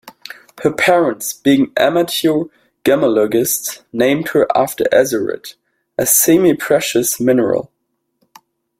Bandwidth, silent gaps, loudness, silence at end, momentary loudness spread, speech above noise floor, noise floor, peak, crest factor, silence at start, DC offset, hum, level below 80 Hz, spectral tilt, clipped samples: 16.5 kHz; none; -14 LUFS; 1.15 s; 11 LU; 56 dB; -70 dBFS; 0 dBFS; 16 dB; 0.05 s; under 0.1%; none; -56 dBFS; -3.5 dB/octave; under 0.1%